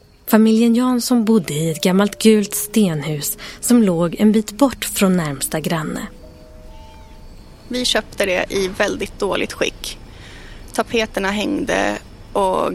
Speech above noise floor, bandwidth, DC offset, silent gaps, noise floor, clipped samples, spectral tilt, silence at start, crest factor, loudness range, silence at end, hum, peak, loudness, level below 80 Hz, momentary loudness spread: 22 dB; 16.5 kHz; under 0.1%; none; -39 dBFS; under 0.1%; -4.5 dB/octave; 0.25 s; 18 dB; 6 LU; 0 s; none; 0 dBFS; -18 LUFS; -42 dBFS; 12 LU